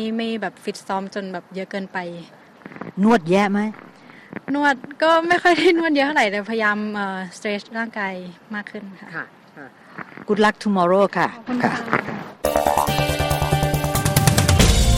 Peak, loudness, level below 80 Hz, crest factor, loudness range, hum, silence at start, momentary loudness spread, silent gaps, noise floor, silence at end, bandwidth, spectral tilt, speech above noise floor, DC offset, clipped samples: 0 dBFS; -20 LUFS; -32 dBFS; 20 dB; 7 LU; none; 0 s; 18 LU; none; -43 dBFS; 0 s; 16.5 kHz; -5 dB/octave; 22 dB; under 0.1%; under 0.1%